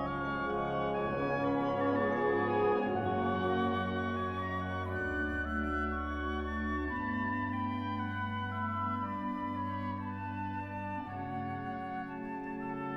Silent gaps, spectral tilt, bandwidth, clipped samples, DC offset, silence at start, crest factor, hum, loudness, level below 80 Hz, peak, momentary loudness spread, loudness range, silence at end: none; -8.5 dB/octave; 7.2 kHz; under 0.1%; under 0.1%; 0 s; 14 dB; none; -35 LUFS; -50 dBFS; -20 dBFS; 8 LU; 6 LU; 0 s